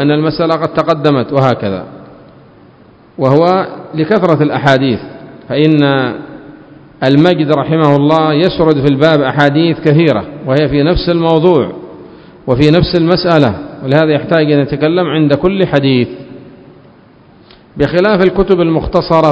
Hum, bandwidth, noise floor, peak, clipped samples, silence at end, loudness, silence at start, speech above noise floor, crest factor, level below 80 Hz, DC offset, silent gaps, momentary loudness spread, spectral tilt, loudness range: none; 8 kHz; -42 dBFS; 0 dBFS; 0.6%; 0 s; -11 LUFS; 0 s; 32 dB; 12 dB; -34 dBFS; under 0.1%; none; 10 LU; -8 dB/octave; 4 LU